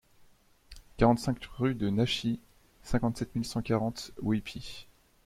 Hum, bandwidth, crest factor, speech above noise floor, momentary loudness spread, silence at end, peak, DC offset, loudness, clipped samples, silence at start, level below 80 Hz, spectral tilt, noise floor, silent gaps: none; 15.5 kHz; 22 dB; 31 dB; 15 LU; 0.45 s; -10 dBFS; under 0.1%; -31 LUFS; under 0.1%; 0.7 s; -48 dBFS; -6 dB/octave; -61 dBFS; none